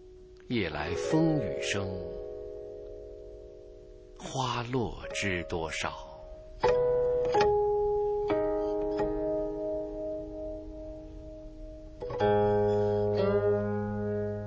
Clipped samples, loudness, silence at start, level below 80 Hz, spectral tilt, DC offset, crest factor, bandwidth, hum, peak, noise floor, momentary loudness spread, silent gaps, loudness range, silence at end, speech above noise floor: under 0.1%; -30 LUFS; 0 s; -48 dBFS; -6 dB/octave; under 0.1%; 18 dB; 8 kHz; none; -12 dBFS; -51 dBFS; 20 LU; none; 8 LU; 0 s; 19 dB